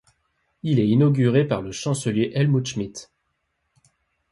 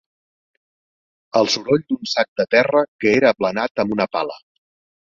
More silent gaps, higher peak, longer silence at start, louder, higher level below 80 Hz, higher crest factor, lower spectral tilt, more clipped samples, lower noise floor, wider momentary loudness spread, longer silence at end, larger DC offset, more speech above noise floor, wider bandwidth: second, none vs 2.28-2.36 s, 2.88-2.99 s, 3.71-3.75 s; second, -6 dBFS vs -2 dBFS; second, 0.65 s vs 1.35 s; second, -22 LUFS vs -19 LUFS; about the same, -56 dBFS vs -60 dBFS; about the same, 16 dB vs 18 dB; first, -6.5 dB/octave vs -4.5 dB/octave; neither; second, -74 dBFS vs under -90 dBFS; first, 14 LU vs 7 LU; first, 1.3 s vs 0.65 s; neither; second, 53 dB vs over 72 dB; first, 11.5 kHz vs 7.6 kHz